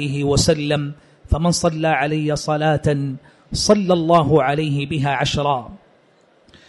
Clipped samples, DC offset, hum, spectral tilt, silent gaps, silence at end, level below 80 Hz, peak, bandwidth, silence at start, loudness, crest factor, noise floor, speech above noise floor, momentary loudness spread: under 0.1%; under 0.1%; none; -5 dB/octave; none; 0.9 s; -36 dBFS; -2 dBFS; 11.5 kHz; 0 s; -18 LUFS; 16 dB; -55 dBFS; 37 dB; 9 LU